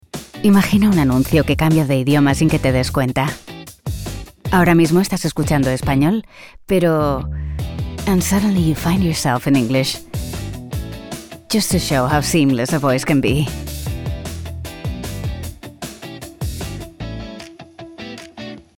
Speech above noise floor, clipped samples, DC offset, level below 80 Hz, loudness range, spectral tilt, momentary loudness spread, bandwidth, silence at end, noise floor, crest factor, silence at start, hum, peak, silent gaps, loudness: 22 dB; under 0.1%; under 0.1%; -34 dBFS; 12 LU; -5.5 dB/octave; 18 LU; 18 kHz; 0.15 s; -38 dBFS; 16 dB; 0.15 s; none; -2 dBFS; none; -17 LUFS